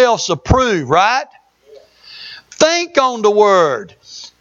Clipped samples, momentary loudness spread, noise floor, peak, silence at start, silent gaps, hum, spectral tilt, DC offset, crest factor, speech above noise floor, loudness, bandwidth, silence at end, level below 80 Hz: under 0.1%; 22 LU; -45 dBFS; 0 dBFS; 0 s; none; none; -4 dB/octave; under 0.1%; 14 dB; 31 dB; -13 LUFS; 7.8 kHz; 0.15 s; -34 dBFS